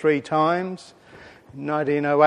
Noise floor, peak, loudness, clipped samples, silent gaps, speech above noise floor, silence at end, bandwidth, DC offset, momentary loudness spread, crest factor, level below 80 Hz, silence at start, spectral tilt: -47 dBFS; -4 dBFS; -23 LUFS; under 0.1%; none; 26 dB; 0 s; 10 kHz; under 0.1%; 16 LU; 18 dB; -66 dBFS; 0 s; -7 dB/octave